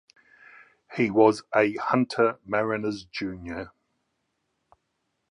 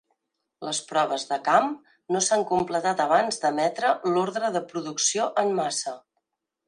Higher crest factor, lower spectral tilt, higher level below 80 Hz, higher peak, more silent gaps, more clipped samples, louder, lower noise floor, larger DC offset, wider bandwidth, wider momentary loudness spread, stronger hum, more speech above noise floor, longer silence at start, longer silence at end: about the same, 22 dB vs 20 dB; first, -6.5 dB/octave vs -2.5 dB/octave; first, -60 dBFS vs -70 dBFS; about the same, -4 dBFS vs -6 dBFS; neither; neither; about the same, -25 LUFS vs -25 LUFS; about the same, -77 dBFS vs -79 dBFS; neither; about the same, 11 kHz vs 11 kHz; first, 16 LU vs 9 LU; neither; about the same, 53 dB vs 55 dB; first, 0.9 s vs 0.6 s; first, 1.6 s vs 0.7 s